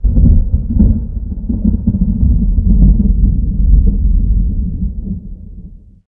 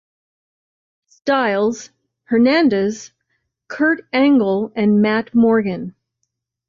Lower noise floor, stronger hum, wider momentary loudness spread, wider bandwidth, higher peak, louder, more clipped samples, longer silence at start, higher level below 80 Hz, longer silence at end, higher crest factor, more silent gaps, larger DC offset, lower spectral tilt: second, -33 dBFS vs -75 dBFS; neither; about the same, 12 LU vs 14 LU; second, 1 kHz vs 7.4 kHz; first, 0 dBFS vs -6 dBFS; first, -14 LUFS vs -17 LUFS; neither; second, 0 s vs 1.25 s; first, -12 dBFS vs -60 dBFS; second, 0.3 s vs 0.8 s; about the same, 10 dB vs 12 dB; neither; neither; first, -16 dB/octave vs -6 dB/octave